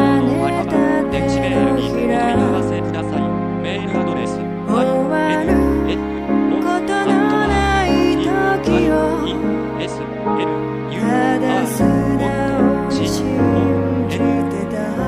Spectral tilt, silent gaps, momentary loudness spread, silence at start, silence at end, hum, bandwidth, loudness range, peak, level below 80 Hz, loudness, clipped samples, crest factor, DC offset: -6.5 dB/octave; none; 6 LU; 0 s; 0 s; none; 15 kHz; 2 LU; -2 dBFS; -34 dBFS; -17 LUFS; under 0.1%; 14 dB; under 0.1%